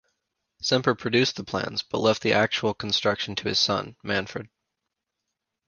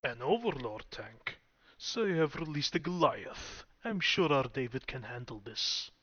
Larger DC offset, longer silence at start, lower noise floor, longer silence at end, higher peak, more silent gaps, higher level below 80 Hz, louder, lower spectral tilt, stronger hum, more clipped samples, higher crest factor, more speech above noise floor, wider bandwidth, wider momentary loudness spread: neither; first, 0.6 s vs 0.05 s; first, -83 dBFS vs -59 dBFS; first, 1.2 s vs 0.15 s; first, -4 dBFS vs -14 dBFS; neither; about the same, -58 dBFS vs -60 dBFS; first, -24 LUFS vs -34 LUFS; about the same, -4 dB/octave vs -4.5 dB/octave; neither; neither; about the same, 22 dB vs 22 dB; first, 58 dB vs 25 dB; first, 10 kHz vs 7 kHz; second, 7 LU vs 14 LU